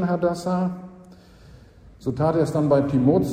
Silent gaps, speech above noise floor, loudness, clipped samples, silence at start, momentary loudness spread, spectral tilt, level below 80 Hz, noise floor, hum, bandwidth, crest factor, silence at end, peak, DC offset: none; 27 dB; -22 LUFS; under 0.1%; 0 s; 13 LU; -8.5 dB/octave; -50 dBFS; -47 dBFS; none; 15 kHz; 16 dB; 0 s; -6 dBFS; under 0.1%